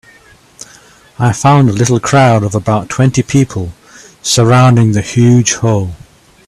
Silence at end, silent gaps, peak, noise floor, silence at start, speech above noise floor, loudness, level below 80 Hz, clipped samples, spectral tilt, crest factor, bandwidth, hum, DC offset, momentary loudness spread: 0.5 s; none; 0 dBFS; -43 dBFS; 1.2 s; 34 dB; -10 LUFS; -42 dBFS; under 0.1%; -5.5 dB/octave; 12 dB; 12.5 kHz; none; under 0.1%; 9 LU